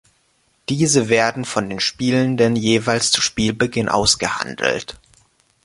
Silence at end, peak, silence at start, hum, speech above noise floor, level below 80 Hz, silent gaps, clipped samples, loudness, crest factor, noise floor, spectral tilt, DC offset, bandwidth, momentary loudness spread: 0.75 s; -2 dBFS; 0.7 s; none; 44 dB; -46 dBFS; none; under 0.1%; -18 LUFS; 18 dB; -62 dBFS; -3.5 dB/octave; under 0.1%; 11.5 kHz; 8 LU